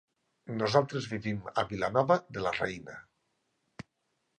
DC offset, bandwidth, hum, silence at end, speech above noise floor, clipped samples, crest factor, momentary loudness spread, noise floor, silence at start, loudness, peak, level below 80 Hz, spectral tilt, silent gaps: under 0.1%; 9.8 kHz; none; 1.35 s; 49 dB; under 0.1%; 24 dB; 23 LU; -79 dBFS; 0.45 s; -31 LUFS; -10 dBFS; -62 dBFS; -6 dB/octave; none